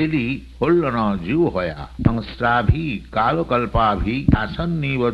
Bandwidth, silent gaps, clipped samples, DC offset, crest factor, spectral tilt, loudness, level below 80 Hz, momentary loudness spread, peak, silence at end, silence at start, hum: 7 kHz; none; under 0.1%; under 0.1%; 18 dB; -9 dB/octave; -20 LUFS; -32 dBFS; 6 LU; -2 dBFS; 0 s; 0 s; none